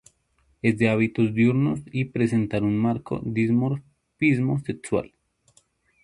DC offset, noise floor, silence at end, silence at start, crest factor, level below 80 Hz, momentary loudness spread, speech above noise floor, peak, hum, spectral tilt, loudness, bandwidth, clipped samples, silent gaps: under 0.1%; -66 dBFS; 1 s; 0.65 s; 16 dB; -54 dBFS; 8 LU; 44 dB; -8 dBFS; none; -8 dB/octave; -24 LUFS; 11 kHz; under 0.1%; none